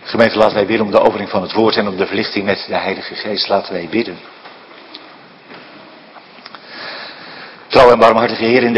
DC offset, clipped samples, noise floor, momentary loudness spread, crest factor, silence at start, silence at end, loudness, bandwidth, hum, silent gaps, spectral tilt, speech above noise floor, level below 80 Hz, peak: under 0.1%; 0.4%; -40 dBFS; 25 LU; 16 dB; 0 s; 0 s; -14 LUFS; 11 kHz; none; none; -6 dB/octave; 25 dB; -48 dBFS; 0 dBFS